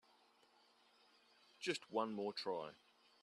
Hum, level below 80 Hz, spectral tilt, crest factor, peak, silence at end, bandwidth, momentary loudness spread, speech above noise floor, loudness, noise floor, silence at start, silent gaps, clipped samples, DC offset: none; under -90 dBFS; -4 dB/octave; 24 dB; -26 dBFS; 0.5 s; 12.5 kHz; 6 LU; 29 dB; -44 LUFS; -73 dBFS; 1.6 s; none; under 0.1%; under 0.1%